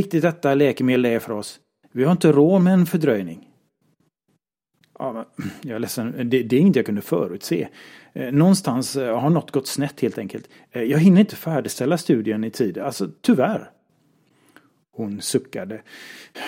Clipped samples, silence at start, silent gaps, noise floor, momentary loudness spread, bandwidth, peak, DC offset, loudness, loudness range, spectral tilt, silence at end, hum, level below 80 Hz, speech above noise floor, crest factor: under 0.1%; 0 s; none; -71 dBFS; 17 LU; 16.5 kHz; -2 dBFS; under 0.1%; -20 LUFS; 6 LU; -6.5 dB/octave; 0 s; none; -68 dBFS; 51 dB; 18 dB